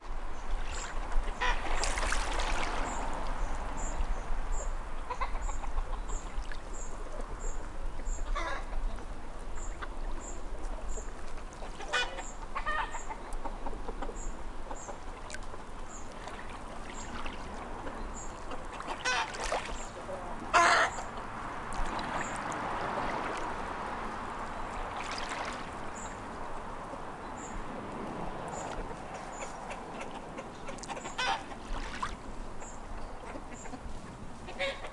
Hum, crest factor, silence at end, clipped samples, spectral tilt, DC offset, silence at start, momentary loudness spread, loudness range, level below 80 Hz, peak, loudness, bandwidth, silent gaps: none; 22 dB; 0 s; under 0.1%; -3 dB/octave; under 0.1%; 0 s; 11 LU; 12 LU; -38 dBFS; -12 dBFS; -37 LUFS; 11.5 kHz; none